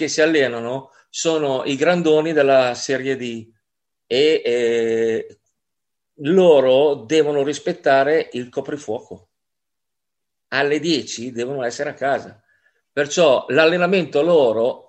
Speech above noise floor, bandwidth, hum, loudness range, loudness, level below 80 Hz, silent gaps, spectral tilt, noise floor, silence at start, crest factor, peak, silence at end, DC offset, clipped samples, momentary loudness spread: 66 dB; 8.6 kHz; none; 6 LU; -18 LUFS; -68 dBFS; none; -4.5 dB/octave; -84 dBFS; 0 s; 18 dB; 0 dBFS; 0.1 s; under 0.1%; under 0.1%; 12 LU